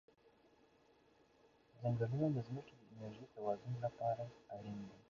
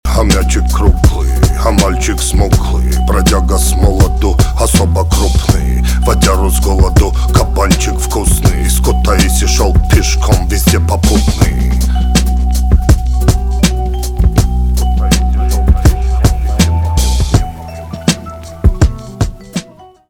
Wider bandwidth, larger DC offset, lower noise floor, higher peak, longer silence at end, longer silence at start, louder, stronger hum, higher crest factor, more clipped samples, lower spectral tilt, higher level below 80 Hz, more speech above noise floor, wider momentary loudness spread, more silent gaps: second, 7.2 kHz vs 17 kHz; neither; first, -71 dBFS vs -35 dBFS; second, -26 dBFS vs 0 dBFS; second, 0.1 s vs 0.25 s; first, 1.75 s vs 0.05 s; second, -43 LUFS vs -12 LUFS; neither; first, 18 dB vs 10 dB; neither; first, -8.5 dB/octave vs -5 dB/octave; second, -74 dBFS vs -12 dBFS; first, 29 dB vs 25 dB; first, 14 LU vs 5 LU; neither